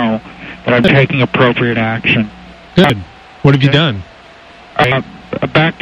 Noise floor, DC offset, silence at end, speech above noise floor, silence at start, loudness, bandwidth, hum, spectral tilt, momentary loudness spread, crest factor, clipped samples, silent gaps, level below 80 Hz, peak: -38 dBFS; under 0.1%; 0.1 s; 26 dB; 0 s; -12 LUFS; 9 kHz; none; -7 dB/octave; 13 LU; 14 dB; under 0.1%; none; -40 dBFS; 0 dBFS